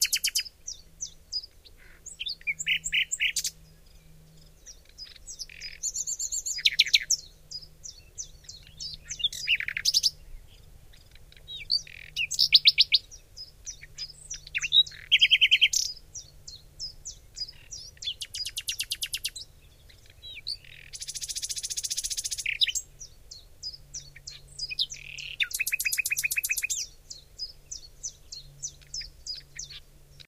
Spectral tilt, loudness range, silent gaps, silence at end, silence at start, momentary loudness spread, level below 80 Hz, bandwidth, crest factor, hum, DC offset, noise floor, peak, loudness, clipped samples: 2.5 dB/octave; 11 LU; none; 0.45 s; 0 s; 23 LU; -54 dBFS; 16 kHz; 28 dB; none; under 0.1%; -54 dBFS; -4 dBFS; -26 LUFS; under 0.1%